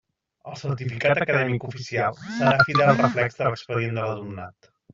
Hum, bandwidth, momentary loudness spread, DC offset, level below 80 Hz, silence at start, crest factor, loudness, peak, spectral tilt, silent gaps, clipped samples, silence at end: none; 7.6 kHz; 16 LU; under 0.1%; -60 dBFS; 0.45 s; 20 dB; -23 LUFS; -4 dBFS; -5 dB/octave; none; under 0.1%; 0.45 s